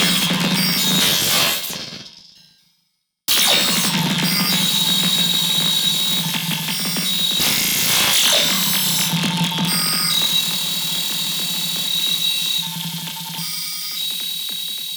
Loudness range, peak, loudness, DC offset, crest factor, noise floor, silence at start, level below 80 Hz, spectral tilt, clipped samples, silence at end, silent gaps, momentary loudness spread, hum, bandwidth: 4 LU; -4 dBFS; -16 LUFS; under 0.1%; 14 dB; -69 dBFS; 0 s; -56 dBFS; -1.5 dB/octave; under 0.1%; 0 s; none; 10 LU; none; over 20 kHz